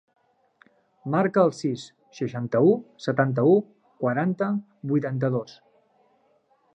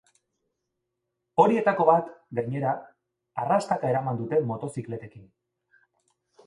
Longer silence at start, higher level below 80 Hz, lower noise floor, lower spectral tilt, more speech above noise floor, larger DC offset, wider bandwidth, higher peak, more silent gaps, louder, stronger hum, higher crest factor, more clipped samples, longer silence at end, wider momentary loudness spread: second, 1.05 s vs 1.35 s; about the same, -72 dBFS vs -70 dBFS; second, -65 dBFS vs -82 dBFS; about the same, -8 dB/octave vs -7.5 dB/octave; second, 41 dB vs 57 dB; neither; second, 9 kHz vs 11.5 kHz; about the same, -6 dBFS vs -4 dBFS; neither; about the same, -24 LUFS vs -26 LUFS; neither; about the same, 20 dB vs 24 dB; neither; about the same, 1.3 s vs 1.25 s; about the same, 13 LU vs 14 LU